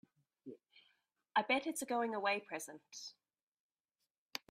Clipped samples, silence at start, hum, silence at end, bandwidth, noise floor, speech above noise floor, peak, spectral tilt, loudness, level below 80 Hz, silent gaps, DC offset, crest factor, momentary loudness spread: under 0.1%; 0.45 s; none; 0.15 s; 15.5 kHz; under -90 dBFS; over 51 dB; -18 dBFS; -2 dB/octave; -38 LUFS; -88 dBFS; 3.43-3.52 s, 3.60-3.84 s, 4.11-4.26 s; under 0.1%; 24 dB; 21 LU